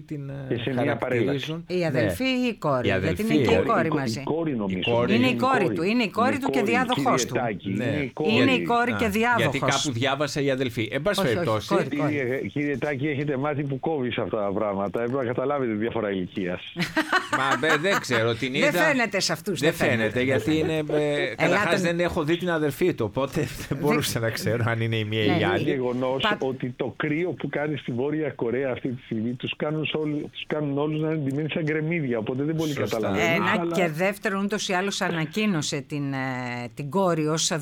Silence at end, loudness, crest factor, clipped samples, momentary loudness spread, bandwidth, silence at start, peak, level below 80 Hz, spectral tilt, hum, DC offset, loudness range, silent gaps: 0 s; -25 LUFS; 18 dB; under 0.1%; 7 LU; 19.5 kHz; 0 s; -6 dBFS; -54 dBFS; -5 dB/octave; none; under 0.1%; 4 LU; none